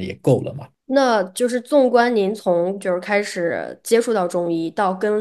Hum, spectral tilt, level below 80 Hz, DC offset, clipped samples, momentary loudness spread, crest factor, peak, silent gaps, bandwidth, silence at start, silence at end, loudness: none; -5.5 dB/octave; -68 dBFS; under 0.1%; under 0.1%; 7 LU; 16 dB; -2 dBFS; none; 12.5 kHz; 0 s; 0 s; -19 LUFS